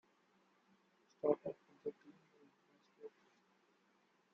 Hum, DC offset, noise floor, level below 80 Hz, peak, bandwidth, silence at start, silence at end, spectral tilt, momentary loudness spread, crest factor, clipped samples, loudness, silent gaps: none; under 0.1%; -76 dBFS; under -90 dBFS; -20 dBFS; 7 kHz; 1.25 s; 1.25 s; -7 dB/octave; 20 LU; 28 dB; under 0.1%; -43 LUFS; none